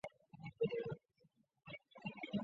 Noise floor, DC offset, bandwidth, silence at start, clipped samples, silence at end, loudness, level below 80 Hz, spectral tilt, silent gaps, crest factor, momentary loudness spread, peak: -76 dBFS; under 0.1%; 7.4 kHz; 0.05 s; under 0.1%; 0 s; -47 LUFS; -78 dBFS; -5.5 dB/octave; none; 20 dB; 14 LU; -28 dBFS